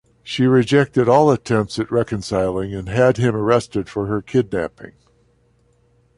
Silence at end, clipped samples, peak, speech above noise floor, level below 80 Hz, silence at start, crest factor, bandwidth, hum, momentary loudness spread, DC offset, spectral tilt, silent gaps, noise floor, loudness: 1.3 s; under 0.1%; -2 dBFS; 41 dB; -46 dBFS; 0.25 s; 16 dB; 11.5 kHz; none; 10 LU; under 0.1%; -6.5 dB/octave; none; -59 dBFS; -18 LUFS